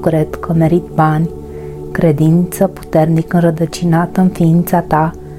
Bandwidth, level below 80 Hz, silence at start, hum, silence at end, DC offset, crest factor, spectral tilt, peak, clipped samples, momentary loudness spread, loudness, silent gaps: 16 kHz; -36 dBFS; 0 s; none; 0 s; under 0.1%; 12 dB; -8 dB/octave; 0 dBFS; under 0.1%; 6 LU; -13 LUFS; none